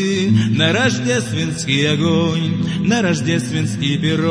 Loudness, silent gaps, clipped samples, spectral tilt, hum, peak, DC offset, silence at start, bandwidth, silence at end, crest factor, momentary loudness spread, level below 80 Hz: -17 LUFS; none; under 0.1%; -5 dB/octave; none; -2 dBFS; under 0.1%; 0 s; 11 kHz; 0 s; 14 dB; 5 LU; -48 dBFS